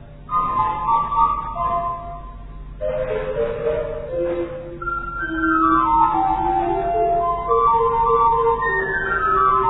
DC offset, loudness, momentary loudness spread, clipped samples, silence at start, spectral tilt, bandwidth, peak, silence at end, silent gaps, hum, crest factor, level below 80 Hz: 0.2%; -20 LUFS; 11 LU; under 0.1%; 0 s; -10 dB/octave; 4.1 kHz; -4 dBFS; 0 s; none; none; 14 dB; -36 dBFS